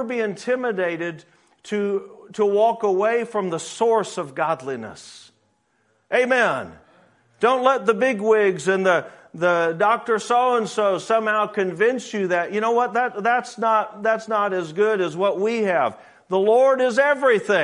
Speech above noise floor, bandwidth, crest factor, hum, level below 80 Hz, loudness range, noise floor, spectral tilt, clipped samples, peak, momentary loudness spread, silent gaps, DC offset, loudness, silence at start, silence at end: 46 dB; 11 kHz; 18 dB; none; -72 dBFS; 4 LU; -66 dBFS; -4.5 dB/octave; under 0.1%; -2 dBFS; 8 LU; none; under 0.1%; -21 LUFS; 0 s; 0 s